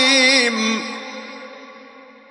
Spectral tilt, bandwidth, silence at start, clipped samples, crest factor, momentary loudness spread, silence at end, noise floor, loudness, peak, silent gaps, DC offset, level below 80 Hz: -1 dB/octave; 11.5 kHz; 0 s; under 0.1%; 16 dB; 25 LU; 0.3 s; -43 dBFS; -15 LUFS; -2 dBFS; none; under 0.1%; -78 dBFS